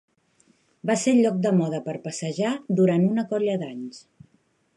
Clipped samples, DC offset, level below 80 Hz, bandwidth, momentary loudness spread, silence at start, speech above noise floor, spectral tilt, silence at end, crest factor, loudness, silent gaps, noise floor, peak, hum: under 0.1%; under 0.1%; -70 dBFS; 11.5 kHz; 13 LU; 0.85 s; 43 dB; -6.5 dB/octave; 0.8 s; 16 dB; -24 LUFS; none; -66 dBFS; -8 dBFS; none